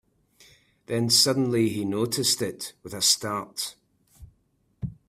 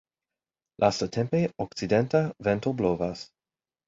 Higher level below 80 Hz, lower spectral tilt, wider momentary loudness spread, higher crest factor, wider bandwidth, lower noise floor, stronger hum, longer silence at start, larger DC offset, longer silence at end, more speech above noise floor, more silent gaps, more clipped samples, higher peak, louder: about the same, -58 dBFS vs -56 dBFS; second, -3 dB/octave vs -6.5 dB/octave; first, 17 LU vs 9 LU; about the same, 22 dB vs 20 dB; first, 16 kHz vs 7.8 kHz; second, -68 dBFS vs under -90 dBFS; neither; about the same, 0.9 s vs 0.8 s; neither; second, 0.15 s vs 0.65 s; second, 43 dB vs over 64 dB; neither; neither; about the same, -6 dBFS vs -8 dBFS; first, -24 LUFS vs -27 LUFS